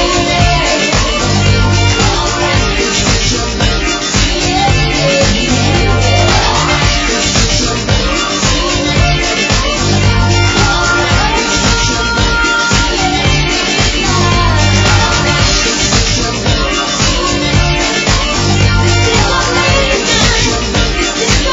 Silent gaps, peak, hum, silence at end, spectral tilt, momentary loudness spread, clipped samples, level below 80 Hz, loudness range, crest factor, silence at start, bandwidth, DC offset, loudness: none; 0 dBFS; none; 0 s; -3.5 dB/octave; 3 LU; under 0.1%; -18 dBFS; 1 LU; 10 dB; 0 s; 7.8 kHz; under 0.1%; -10 LUFS